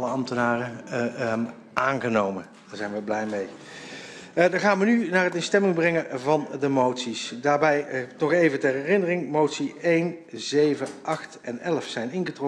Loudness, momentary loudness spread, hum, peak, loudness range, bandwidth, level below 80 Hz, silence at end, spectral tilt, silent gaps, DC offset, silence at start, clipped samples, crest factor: -25 LUFS; 11 LU; none; -6 dBFS; 5 LU; 11 kHz; -68 dBFS; 0 s; -5.5 dB/octave; none; under 0.1%; 0 s; under 0.1%; 20 dB